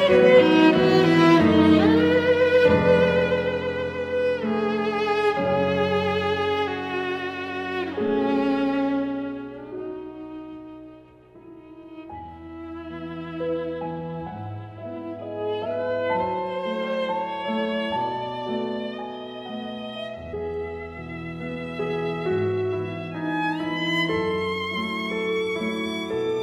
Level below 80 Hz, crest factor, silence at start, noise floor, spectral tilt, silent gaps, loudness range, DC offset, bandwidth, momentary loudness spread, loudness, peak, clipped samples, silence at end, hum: -54 dBFS; 18 dB; 0 s; -48 dBFS; -7 dB/octave; none; 15 LU; under 0.1%; 10.5 kHz; 18 LU; -23 LUFS; -4 dBFS; under 0.1%; 0 s; none